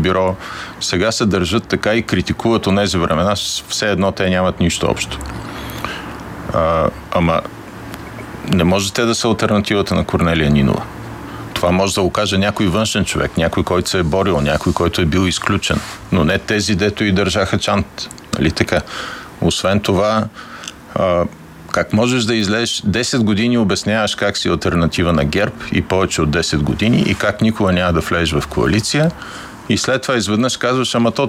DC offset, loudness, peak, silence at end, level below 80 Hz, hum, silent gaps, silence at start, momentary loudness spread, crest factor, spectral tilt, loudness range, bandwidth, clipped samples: under 0.1%; -16 LUFS; 0 dBFS; 0 s; -34 dBFS; none; none; 0 s; 11 LU; 16 dB; -5 dB/octave; 3 LU; 16 kHz; under 0.1%